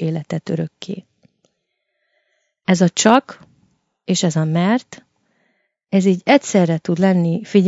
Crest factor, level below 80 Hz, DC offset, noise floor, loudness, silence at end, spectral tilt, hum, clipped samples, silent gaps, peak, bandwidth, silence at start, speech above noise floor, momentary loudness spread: 18 dB; -66 dBFS; under 0.1%; -73 dBFS; -17 LUFS; 0 s; -5.5 dB/octave; none; under 0.1%; none; 0 dBFS; 8 kHz; 0 s; 57 dB; 13 LU